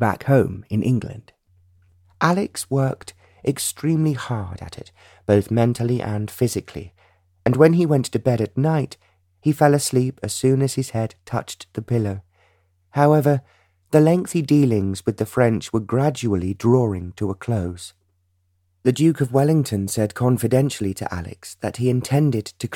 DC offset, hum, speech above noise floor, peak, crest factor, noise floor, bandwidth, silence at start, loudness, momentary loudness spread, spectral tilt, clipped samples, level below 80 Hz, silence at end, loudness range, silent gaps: under 0.1%; none; 46 dB; -2 dBFS; 20 dB; -66 dBFS; 17 kHz; 0 s; -21 LUFS; 13 LU; -6.5 dB/octave; under 0.1%; -52 dBFS; 0 s; 4 LU; none